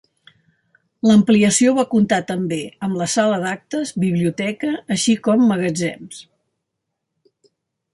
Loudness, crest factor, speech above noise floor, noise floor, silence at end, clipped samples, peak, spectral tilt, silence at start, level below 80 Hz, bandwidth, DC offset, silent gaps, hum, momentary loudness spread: -18 LUFS; 16 dB; 61 dB; -78 dBFS; 1.7 s; under 0.1%; -4 dBFS; -5 dB/octave; 1.05 s; -58 dBFS; 11.5 kHz; under 0.1%; none; none; 11 LU